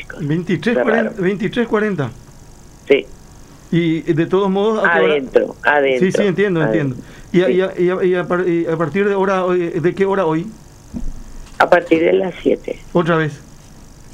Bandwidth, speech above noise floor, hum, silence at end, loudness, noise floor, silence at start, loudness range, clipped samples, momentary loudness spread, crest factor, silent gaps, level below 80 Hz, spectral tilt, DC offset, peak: 11 kHz; 24 dB; none; 0 s; -16 LUFS; -40 dBFS; 0 s; 3 LU; under 0.1%; 8 LU; 16 dB; none; -40 dBFS; -7 dB/octave; under 0.1%; 0 dBFS